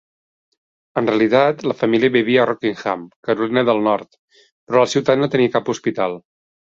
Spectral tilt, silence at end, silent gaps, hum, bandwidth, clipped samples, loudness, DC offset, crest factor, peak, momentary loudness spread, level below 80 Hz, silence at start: -5.5 dB/octave; 0.5 s; 3.16-3.23 s, 4.18-4.28 s, 4.52-4.67 s; none; 7.8 kHz; under 0.1%; -18 LUFS; under 0.1%; 16 dB; -2 dBFS; 9 LU; -60 dBFS; 0.95 s